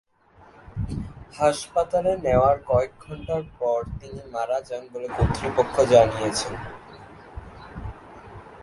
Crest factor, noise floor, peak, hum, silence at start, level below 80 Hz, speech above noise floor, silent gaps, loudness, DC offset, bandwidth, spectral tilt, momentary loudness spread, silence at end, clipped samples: 22 dB; -54 dBFS; -2 dBFS; none; 0.65 s; -40 dBFS; 31 dB; none; -24 LUFS; under 0.1%; 11.5 kHz; -5.5 dB/octave; 23 LU; 0 s; under 0.1%